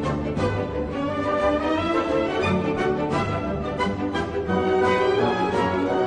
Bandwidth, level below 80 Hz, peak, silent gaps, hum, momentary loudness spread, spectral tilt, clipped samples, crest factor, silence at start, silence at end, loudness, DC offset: 10 kHz; -42 dBFS; -8 dBFS; none; none; 6 LU; -6.5 dB/octave; under 0.1%; 14 dB; 0 s; 0 s; -23 LUFS; under 0.1%